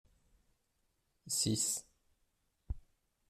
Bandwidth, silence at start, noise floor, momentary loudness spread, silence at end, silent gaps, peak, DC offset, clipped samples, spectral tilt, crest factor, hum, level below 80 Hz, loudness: 15.5 kHz; 1.25 s; -80 dBFS; 17 LU; 0.5 s; none; -22 dBFS; under 0.1%; under 0.1%; -3 dB/octave; 20 dB; none; -58 dBFS; -35 LUFS